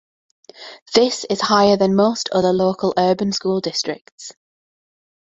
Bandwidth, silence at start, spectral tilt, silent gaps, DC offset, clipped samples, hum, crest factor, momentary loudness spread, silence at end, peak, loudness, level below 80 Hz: 8 kHz; 0.6 s; -4.5 dB/octave; 0.82-0.86 s, 4.01-4.05 s, 4.12-4.18 s; under 0.1%; under 0.1%; none; 18 dB; 22 LU; 0.95 s; 0 dBFS; -18 LUFS; -58 dBFS